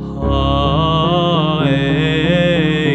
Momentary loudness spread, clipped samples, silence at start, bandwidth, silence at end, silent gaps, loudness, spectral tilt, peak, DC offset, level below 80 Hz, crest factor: 2 LU; under 0.1%; 0 s; 8.4 kHz; 0 s; none; -15 LUFS; -7.5 dB/octave; -2 dBFS; under 0.1%; -28 dBFS; 12 dB